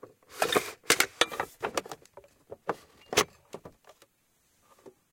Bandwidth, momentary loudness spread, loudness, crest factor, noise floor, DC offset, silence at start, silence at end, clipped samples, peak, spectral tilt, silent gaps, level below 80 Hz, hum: 16.5 kHz; 23 LU; -29 LUFS; 28 dB; -70 dBFS; under 0.1%; 0.3 s; 0.25 s; under 0.1%; -6 dBFS; -1 dB/octave; none; -68 dBFS; none